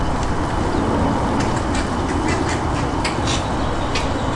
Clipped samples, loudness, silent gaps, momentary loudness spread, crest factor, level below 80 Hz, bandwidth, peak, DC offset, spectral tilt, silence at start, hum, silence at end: under 0.1%; -20 LUFS; none; 3 LU; 14 dB; -28 dBFS; 11.5 kHz; -6 dBFS; under 0.1%; -5.5 dB/octave; 0 s; none; 0 s